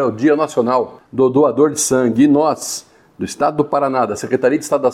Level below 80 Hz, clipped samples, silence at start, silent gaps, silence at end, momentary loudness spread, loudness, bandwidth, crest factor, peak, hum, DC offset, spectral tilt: -58 dBFS; under 0.1%; 0 s; none; 0 s; 11 LU; -16 LUFS; 15 kHz; 12 dB; -2 dBFS; none; under 0.1%; -5 dB/octave